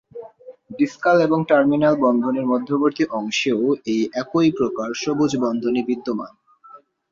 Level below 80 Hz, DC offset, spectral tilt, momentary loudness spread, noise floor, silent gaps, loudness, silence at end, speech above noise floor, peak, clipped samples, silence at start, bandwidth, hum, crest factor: -62 dBFS; under 0.1%; -5.5 dB/octave; 8 LU; -48 dBFS; none; -20 LUFS; 0.35 s; 28 dB; -4 dBFS; under 0.1%; 0.15 s; 7.6 kHz; none; 18 dB